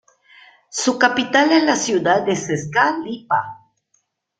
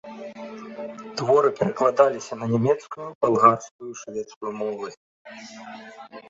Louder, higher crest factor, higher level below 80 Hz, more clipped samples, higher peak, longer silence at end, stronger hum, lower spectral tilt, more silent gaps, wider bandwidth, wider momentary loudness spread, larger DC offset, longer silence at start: first, -18 LUFS vs -22 LUFS; about the same, 18 dB vs 22 dB; about the same, -62 dBFS vs -66 dBFS; neither; about the same, 0 dBFS vs -2 dBFS; first, 0.85 s vs 0.1 s; neither; second, -3.5 dB/octave vs -6 dB/octave; second, none vs 3.15-3.21 s, 3.71-3.79 s, 4.36-4.41 s, 4.97-5.25 s; first, 9.4 kHz vs 7.8 kHz; second, 8 LU vs 22 LU; neither; first, 0.75 s vs 0.05 s